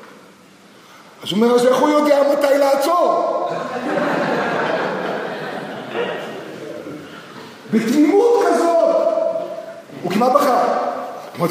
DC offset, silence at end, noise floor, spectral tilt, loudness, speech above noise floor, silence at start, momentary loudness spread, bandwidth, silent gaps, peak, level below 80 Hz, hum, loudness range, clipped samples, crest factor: under 0.1%; 0 s; -46 dBFS; -5 dB/octave; -17 LUFS; 31 dB; 0 s; 17 LU; 15.5 kHz; none; 0 dBFS; -72 dBFS; none; 7 LU; under 0.1%; 18 dB